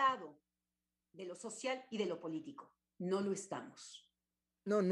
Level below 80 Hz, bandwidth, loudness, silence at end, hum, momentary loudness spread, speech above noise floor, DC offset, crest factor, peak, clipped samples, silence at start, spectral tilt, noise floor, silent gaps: -90 dBFS; 11.5 kHz; -42 LUFS; 0 s; 60 Hz at -70 dBFS; 17 LU; over 48 dB; under 0.1%; 20 dB; -22 dBFS; under 0.1%; 0 s; -5 dB/octave; under -90 dBFS; none